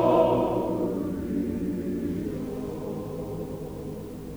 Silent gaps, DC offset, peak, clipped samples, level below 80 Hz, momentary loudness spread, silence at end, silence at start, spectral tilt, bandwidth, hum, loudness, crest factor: none; under 0.1%; -8 dBFS; under 0.1%; -48 dBFS; 13 LU; 0 s; 0 s; -8 dB/octave; over 20 kHz; none; -29 LUFS; 18 dB